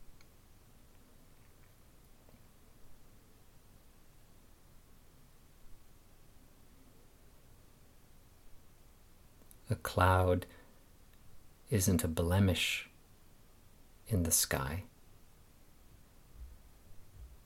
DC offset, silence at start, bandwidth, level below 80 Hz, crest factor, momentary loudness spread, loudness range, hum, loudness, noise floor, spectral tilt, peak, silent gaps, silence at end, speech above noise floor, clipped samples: under 0.1%; 0 s; 17 kHz; -56 dBFS; 28 dB; 27 LU; 4 LU; none; -32 LUFS; -60 dBFS; -4.5 dB/octave; -12 dBFS; none; 0.1 s; 28 dB; under 0.1%